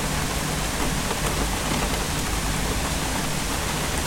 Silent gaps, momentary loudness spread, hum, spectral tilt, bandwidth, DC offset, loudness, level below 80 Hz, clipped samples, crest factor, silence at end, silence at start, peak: none; 1 LU; none; -3.5 dB/octave; 16.5 kHz; under 0.1%; -25 LUFS; -32 dBFS; under 0.1%; 14 dB; 0 s; 0 s; -10 dBFS